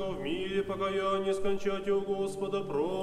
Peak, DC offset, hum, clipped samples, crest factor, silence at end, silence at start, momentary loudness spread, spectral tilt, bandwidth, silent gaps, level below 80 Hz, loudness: -18 dBFS; under 0.1%; none; under 0.1%; 14 dB; 0 s; 0 s; 4 LU; -5.5 dB/octave; 12.5 kHz; none; -52 dBFS; -32 LUFS